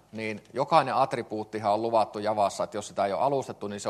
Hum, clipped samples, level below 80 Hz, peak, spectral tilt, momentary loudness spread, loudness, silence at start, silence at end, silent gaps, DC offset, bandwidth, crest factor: none; under 0.1%; -70 dBFS; -4 dBFS; -5 dB/octave; 10 LU; -28 LUFS; 0.15 s; 0 s; none; under 0.1%; 13 kHz; 22 dB